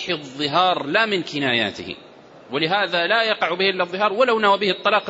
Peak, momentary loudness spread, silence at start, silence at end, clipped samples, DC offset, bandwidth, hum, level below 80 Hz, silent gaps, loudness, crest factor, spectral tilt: -4 dBFS; 8 LU; 0 s; 0 s; under 0.1%; under 0.1%; 8 kHz; none; -66 dBFS; none; -19 LUFS; 16 dB; -4.5 dB/octave